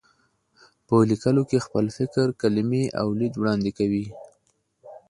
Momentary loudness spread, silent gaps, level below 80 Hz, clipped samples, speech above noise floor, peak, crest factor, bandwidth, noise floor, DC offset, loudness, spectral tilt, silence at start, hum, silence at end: 5 LU; none; -56 dBFS; under 0.1%; 46 dB; -6 dBFS; 18 dB; 11.5 kHz; -69 dBFS; under 0.1%; -24 LUFS; -7.5 dB/octave; 0.9 s; none; 0.1 s